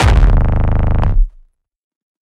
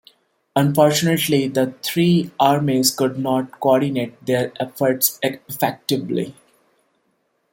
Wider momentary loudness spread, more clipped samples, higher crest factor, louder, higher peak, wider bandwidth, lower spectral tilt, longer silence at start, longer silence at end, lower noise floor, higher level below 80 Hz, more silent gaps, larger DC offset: about the same, 8 LU vs 9 LU; neither; second, 12 dB vs 18 dB; first, -15 LUFS vs -19 LUFS; about the same, 0 dBFS vs -2 dBFS; second, 9.4 kHz vs 17 kHz; first, -7 dB/octave vs -5 dB/octave; second, 0 s vs 0.55 s; second, 0.95 s vs 1.2 s; second, -46 dBFS vs -68 dBFS; first, -14 dBFS vs -62 dBFS; neither; neither